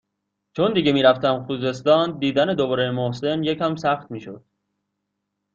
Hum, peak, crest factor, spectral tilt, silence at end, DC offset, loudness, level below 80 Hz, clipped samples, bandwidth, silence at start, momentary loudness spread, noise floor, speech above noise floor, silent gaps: 50 Hz at -50 dBFS; -4 dBFS; 18 dB; -6.5 dB/octave; 1.15 s; under 0.1%; -21 LUFS; -60 dBFS; under 0.1%; 7.6 kHz; 0.55 s; 10 LU; -78 dBFS; 58 dB; none